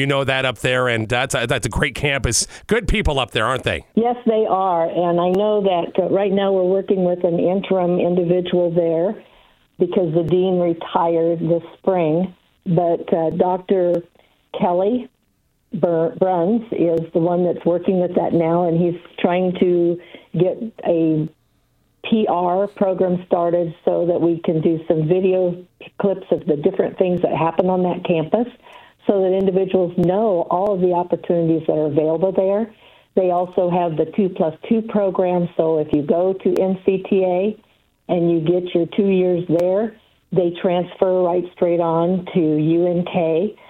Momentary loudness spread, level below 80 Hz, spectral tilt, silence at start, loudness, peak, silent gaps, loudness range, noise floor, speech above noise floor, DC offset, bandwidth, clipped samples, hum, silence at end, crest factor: 4 LU; -40 dBFS; -6 dB/octave; 0 s; -19 LUFS; 0 dBFS; none; 2 LU; -64 dBFS; 46 dB; under 0.1%; 12.5 kHz; under 0.1%; none; 0.15 s; 18 dB